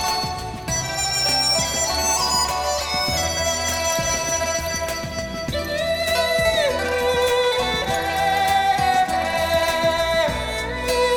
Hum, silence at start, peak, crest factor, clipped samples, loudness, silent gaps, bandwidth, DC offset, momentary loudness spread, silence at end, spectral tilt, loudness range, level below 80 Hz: none; 0 s; -8 dBFS; 14 dB; under 0.1%; -20 LUFS; none; 17.5 kHz; under 0.1%; 7 LU; 0 s; -2 dB/octave; 2 LU; -38 dBFS